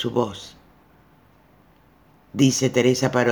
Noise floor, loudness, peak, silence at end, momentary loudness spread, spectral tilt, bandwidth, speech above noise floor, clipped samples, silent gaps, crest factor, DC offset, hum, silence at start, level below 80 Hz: -55 dBFS; -20 LUFS; -4 dBFS; 0 s; 19 LU; -5 dB/octave; over 20 kHz; 35 dB; under 0.1%; none; 20 dB; under 0.1%; none; 0 s; -60 dBFS